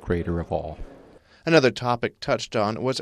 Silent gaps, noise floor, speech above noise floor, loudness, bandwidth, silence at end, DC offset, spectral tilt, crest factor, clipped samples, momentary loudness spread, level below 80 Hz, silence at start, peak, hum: none; -51 dBFS; 27 dB; -24 LUFS; 12 kHz; 0 s; under 0.1%; -5.5 dB/octave; 22 dB; under 0.1%; 13 LU; -44 dBFS; 0 s; -4 dBFS; none